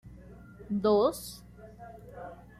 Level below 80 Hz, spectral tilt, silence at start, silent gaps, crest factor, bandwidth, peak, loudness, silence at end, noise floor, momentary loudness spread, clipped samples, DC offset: -56 dBFS; -6 dB/octave; 0.05 s; none; 18 dB; 15 kHz; -14 dBFS; -28 LUFS; 0.25 s; -50 dBFS; 26 LU; under 0.1%; under 0.1%